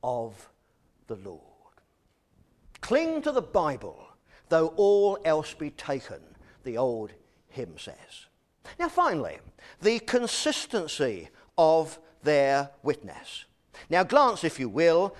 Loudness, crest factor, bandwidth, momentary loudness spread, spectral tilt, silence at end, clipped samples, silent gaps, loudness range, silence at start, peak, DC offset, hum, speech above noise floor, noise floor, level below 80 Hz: -26 LUFS; 22 dB; 12.5 kHz; 20 LU; -4.5 dB/octave; 0 s; under 0.1%; none; 7 LU; 0.05 s; -6 dBFS; under 0.1%; none; 43 dB; -70 dBFS; -60 dBFS